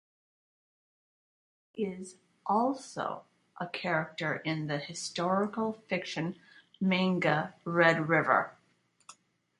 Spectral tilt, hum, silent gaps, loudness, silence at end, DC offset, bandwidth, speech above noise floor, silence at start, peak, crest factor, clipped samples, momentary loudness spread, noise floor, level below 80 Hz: -5.5 dB/octave; none; none; -31 LUFS; 0.45 s; under 0.1%; 11.5 kHz; 40 dB; 1.75 s; -10 dBFS; 24 dB; under 0.1%; 15 LU; -71 dBFS; -76 dBFS